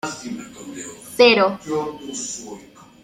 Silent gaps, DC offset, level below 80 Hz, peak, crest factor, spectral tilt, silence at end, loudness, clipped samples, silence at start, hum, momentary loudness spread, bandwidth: none; under 0.1%; -62 dBFS; -2 dBFS; 20 dB; -3 dB/octave; 0.4 s; -19 LUFS; under 0.1%; 0.05 s; none; 21 LU; 15 kHz